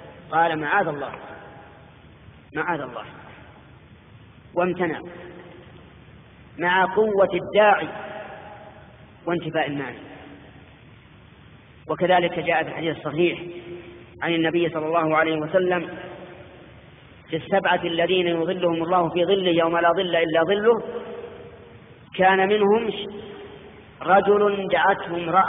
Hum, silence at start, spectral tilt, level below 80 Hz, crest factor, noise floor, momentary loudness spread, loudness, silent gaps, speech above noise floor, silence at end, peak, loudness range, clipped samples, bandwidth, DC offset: none; 0 s; -3 dB/octave; -58 dBFS; 18 dB; -48 dBFS; 22 LU; -22 LUFS; none; 27 dB; 0 s; -4 dBFS; 10 LU; under 0.1%; 3.9 kHz; under 0.1%